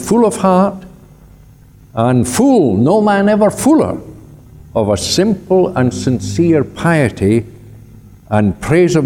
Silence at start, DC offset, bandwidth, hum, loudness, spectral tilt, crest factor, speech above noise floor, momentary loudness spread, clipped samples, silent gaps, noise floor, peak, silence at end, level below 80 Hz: 0 s; under 0.1%; 18 kHz; none; -13 LUFS; -6 dB/octave; 12 dB; 29 dB; 7 LU; under 0.1%; none; -41 dBFS; 0 dBFS; 0 s; -40 dBFS